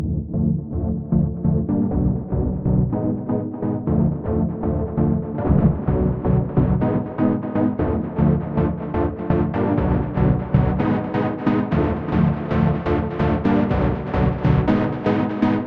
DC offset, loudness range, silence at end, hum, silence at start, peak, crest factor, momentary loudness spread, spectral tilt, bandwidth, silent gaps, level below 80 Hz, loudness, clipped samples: under 0.1%; 2 LU; 0 s; none; 0 s; -2 dBFS; 16 dB; 4 LU; -11 dB/octave; 5.2 kHz; none; -32 dBFS; -21 LUFS; under 0.1%